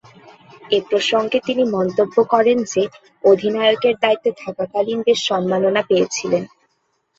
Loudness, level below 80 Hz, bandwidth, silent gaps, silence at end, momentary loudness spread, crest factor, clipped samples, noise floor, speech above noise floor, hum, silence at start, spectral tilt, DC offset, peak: -18 LUFS; -64 dBFS; 8 kHz; none; 0.7 s; 7 LU; 16 dB; under 0.1%; -67 dBFS; 50 dB; none; 0.65 s; -4 dB/octave; under 0.1%; -2 dBFS